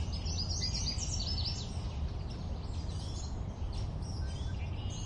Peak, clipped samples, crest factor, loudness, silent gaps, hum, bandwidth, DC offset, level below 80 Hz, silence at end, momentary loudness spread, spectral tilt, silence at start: -22 dBFS; under 0.1%; 14 dB; -37 LUFS; none; none; 10.5 kHz; under 0.1%; -40 dBFS; 0 s; 7 LU; -4 dB/octave; 0 s